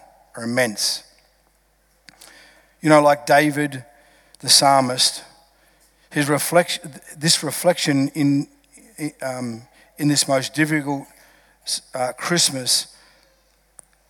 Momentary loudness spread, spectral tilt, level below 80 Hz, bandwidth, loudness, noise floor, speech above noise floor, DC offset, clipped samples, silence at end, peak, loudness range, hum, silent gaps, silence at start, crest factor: 17 LU; -3 dB/octave; -66 dBFS; over 20 kHz; -19 LUFS; -61 dBFS; 42 dB; under 0.1%; under 0.1%; 1.25 s; 0 dBFS; 6 LU; none; none; 0.35 s; 22 dB